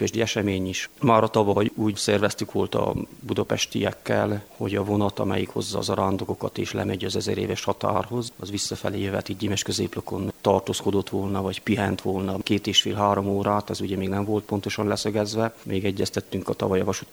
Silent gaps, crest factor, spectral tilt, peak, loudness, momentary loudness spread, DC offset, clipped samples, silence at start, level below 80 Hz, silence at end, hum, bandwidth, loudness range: none; 22 dB; -5 dB/octave; -4 dBFS; -25 LUFS; 7 LU; under 0.1%; under 0.1%; 0 s; -56 dBFS; 0.1 s; none; over 20 kHz; 3 LU